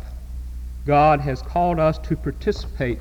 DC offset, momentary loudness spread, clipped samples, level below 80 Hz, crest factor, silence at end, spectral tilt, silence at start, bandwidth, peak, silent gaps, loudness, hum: under 0.1%; 18 LU; under 0.1%; -32 dBFS; 14 dB; 0 s; -8 dB/octave; 0 s; 18 kHz; -6 dBFS; none; -21 LUFS; none